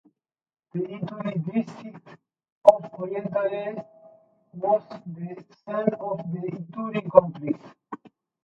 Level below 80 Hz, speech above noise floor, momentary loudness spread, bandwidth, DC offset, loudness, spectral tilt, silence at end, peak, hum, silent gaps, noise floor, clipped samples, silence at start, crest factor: -70 dBFS; 40 dB; 23 LU; 7.6 kHz; under 0.1%; -26 LUFS; -8.5 dB/octave; 0.4 s; 0 dBFS; none; 2.52-2.61 s; -66 dBFS; under 0.1%; 0.75 s; 26 dB